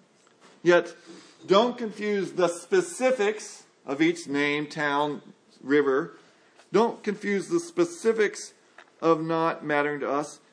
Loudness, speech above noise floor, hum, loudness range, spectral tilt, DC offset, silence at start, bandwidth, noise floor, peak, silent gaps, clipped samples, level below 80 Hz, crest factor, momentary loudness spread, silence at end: -26 LUFS; 32 dB; none; 2 LU; -4.5 dB/octave; under 0.1%; 0.65 s; 10.5 kHz; -58 dBFS; -6 dBFS; none; under 0.1%; -84 dBFS; 20 dB; 15 LU; 0.15 s